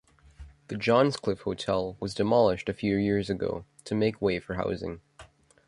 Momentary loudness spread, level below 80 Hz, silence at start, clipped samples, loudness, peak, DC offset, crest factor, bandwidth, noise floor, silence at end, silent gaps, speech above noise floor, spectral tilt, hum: 11 LU; -52 dBFS; 0.4 s; under 0.1%; -28 LUFS; -8 dBFS; under 0.1%; 20 dB; 11.5 kHz; -54 dBFS; 0.4 s; none; 27 dB; -6.5 dB/octave; none